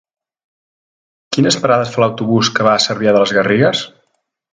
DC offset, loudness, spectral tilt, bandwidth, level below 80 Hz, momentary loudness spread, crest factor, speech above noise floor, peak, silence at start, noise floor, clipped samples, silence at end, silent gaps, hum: under 0.1%; -14 LUFS; -4.5 dB/octave; 9.6 kHz; -56 dBFS; 5 LU; 16 dB; 53 dB; 0 dBFS; 1.3 s; -66 dBFS; under 0.1%; 0.65 s; none; none